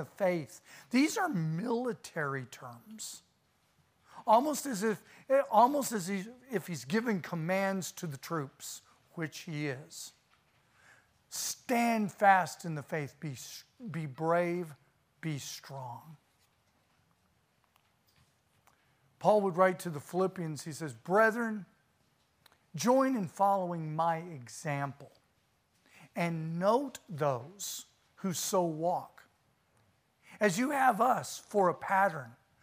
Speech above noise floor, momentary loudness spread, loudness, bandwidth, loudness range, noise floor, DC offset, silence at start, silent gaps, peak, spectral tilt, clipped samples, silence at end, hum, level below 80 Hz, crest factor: 41 dB; 17 LU; -32 LUFS; 15.5 kHz; 7 LU; -73 dBFS; under 0.1%; 0 s; none; -12 dBFS; -5 dB/octave; under 0.1%; 0.3 s; none; -80 dBFS; 22 dB